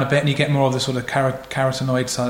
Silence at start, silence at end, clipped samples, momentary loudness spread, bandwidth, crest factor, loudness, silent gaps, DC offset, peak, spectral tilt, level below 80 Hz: 0 s; 0 s; under 0.1%; 4 LU; 16.5 kHz; 16 dB; -20 LUFS; none; under 0.1%; -4 dBFS; -5 dB/octave; -50 dBFS